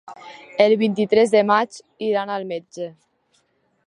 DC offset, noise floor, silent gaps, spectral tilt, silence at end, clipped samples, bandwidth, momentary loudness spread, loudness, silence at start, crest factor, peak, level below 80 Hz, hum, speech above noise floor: under 0.1%; -66 dBFS; none; -5.5 dB/octave; 0.95 s; under 0.1%; 10.5 kHz; 18 LU; -19 LUFS; 0.1 s; 18 dB; -2 dBFS; -70 dBFS; none; 47 dB